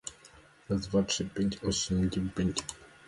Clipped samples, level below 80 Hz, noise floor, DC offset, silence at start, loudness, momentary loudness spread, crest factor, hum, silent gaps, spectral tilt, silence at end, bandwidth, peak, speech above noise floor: under 0.1%; -48 dBFS; -57 dBFS; under 0.1%; 0.05 s; -31 LUFS; 7 LU; 18 dB; none; none; -4.5 dB/octave; 0.2 s; 11.5 kHz; -14 dBFS; 26 dB